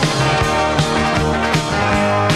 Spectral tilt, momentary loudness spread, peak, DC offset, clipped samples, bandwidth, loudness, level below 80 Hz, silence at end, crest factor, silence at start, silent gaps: -5 dB/octave; 1 LU; 0 dBFS; under 0.1%; under 0.1%; 14 kHz; -16 LUFS; -30 dBFS; 0 s; 16 dB; 0 s; none